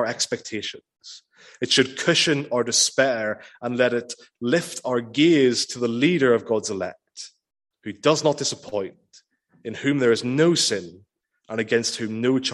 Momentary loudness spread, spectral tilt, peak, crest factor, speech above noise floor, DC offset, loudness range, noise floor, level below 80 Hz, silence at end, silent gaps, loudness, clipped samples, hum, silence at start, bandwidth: 19 LU; -3.5 dB/octave; -4 dBFS; 20 dB; 35 dB; under 0.1%; 4 LU; -57 dBFS; -68 dBFS; 0 s; none; -22 LUFS; under 0.1%; none; 0 s; 12.5 kHz